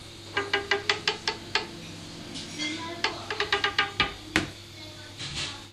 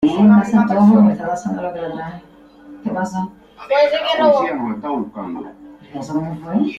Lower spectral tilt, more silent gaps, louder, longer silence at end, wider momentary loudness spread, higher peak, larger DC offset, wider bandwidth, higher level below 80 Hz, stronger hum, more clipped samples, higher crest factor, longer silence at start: second, -2.5 dB/octave vs -7 dB/octave; neither; second, -29 LUFS vs -16 LUFS; about the same, 0 s vs 0 s; second, 15 LU vs 18 LU; second, -6 dBFS vs -2 dBFS; neither; first, 15.5 kHz vs 7.4 kHz; about the same, -54 dBFS vs -54 dBFS; neither; neither; first, 26 dB vs 14 dB; about the same, 0 s vs 0 s